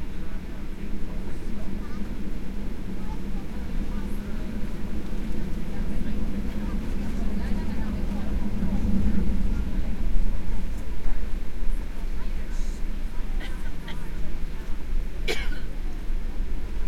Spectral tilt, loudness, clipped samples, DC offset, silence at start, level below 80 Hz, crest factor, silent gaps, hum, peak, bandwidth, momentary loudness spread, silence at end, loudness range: -6.5 dB/octave; -33 LUFS; under 0.1%; under 0.1%; 0 s; -28 dBFS; 16 dB; none; none; -6 dBFS; 7.8 kHz; 8 LU; 0 s; 6 LU